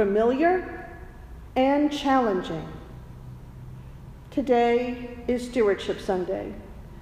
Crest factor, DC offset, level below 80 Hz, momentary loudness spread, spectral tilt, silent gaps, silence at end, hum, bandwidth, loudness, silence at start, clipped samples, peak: 16 dB; under 0.1%; -46 dBFS; 22 LU; -6 dB/octave; none; 0 s; none; 14.5 kHz; -25 LUFS; 0 s; under 0.1%; -10 dBFS